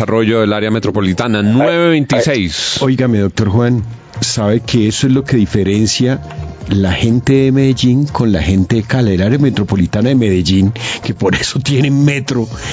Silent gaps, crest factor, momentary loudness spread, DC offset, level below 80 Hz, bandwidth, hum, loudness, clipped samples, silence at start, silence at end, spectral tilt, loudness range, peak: none; 12 dB; 5 LU; under 0.1%; -30 dBFS; 8 kHz; none; -13 LUFS; under 0.1%; 0 s; 0 s; -6 dB/octave; 1 LU; 0 dBFS